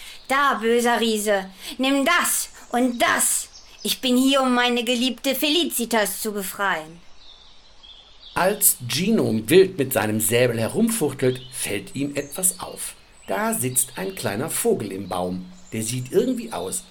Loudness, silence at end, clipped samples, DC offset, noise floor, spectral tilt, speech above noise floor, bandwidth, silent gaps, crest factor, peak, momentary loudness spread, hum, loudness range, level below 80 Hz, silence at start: -21 LUFS; 0.1 s; under 0.1%; under 0.1%; -47 dBFS; -3 dB/octave; 25 dB; 18 kHz; none; 22 dB; 0 dBFS; 10 LU; none; 5 LU; -54 dBFS; 0 s